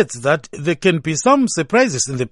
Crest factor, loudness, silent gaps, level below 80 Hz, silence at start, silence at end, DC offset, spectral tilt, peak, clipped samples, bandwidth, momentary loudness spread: 16 dB; -17 LUFS; none; -54 dBFS; 0 s; 0.05 s; under 0.1%; -4.5 dB/octave; 0 dBFS; under 0.1%; 11.5 kHz; 5 LU